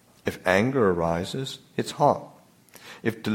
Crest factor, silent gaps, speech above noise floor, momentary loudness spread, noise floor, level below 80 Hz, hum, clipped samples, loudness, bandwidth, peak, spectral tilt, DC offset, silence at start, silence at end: 22 dB; none; 28 dB; 11 LU; -53 dBFS; -56 dBFS; none; under 0.1%; -25 LUFS; 16.5 kHz; -4 dBFS; -5.5 dB/octave; under 0.1%; 0.25 s; 0 s